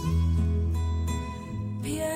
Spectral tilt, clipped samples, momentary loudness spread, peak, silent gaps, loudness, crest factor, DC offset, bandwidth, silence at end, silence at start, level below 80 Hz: -6.5 dB/octave; under 0.1%; 9 LU; -16 dBFS; none; -29 LUFS; 12 dB; under 0.1%; 15.5 kHz; 0 s; 0 s; -32 dBFS